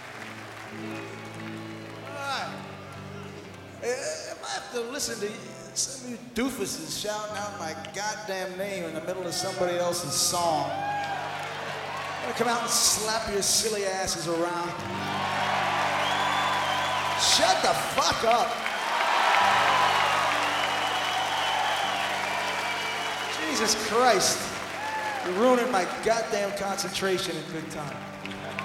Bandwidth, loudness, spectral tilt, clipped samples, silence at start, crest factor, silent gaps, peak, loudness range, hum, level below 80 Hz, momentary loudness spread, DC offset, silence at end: 16.5 kHz; -26 LUFS; -2 dB/octave; under 0.1%; 0 s; 22 dB; none; -6 dBFS; 10 LU; none; -60 dBFS; 15 LU; under 0.1%; 0 s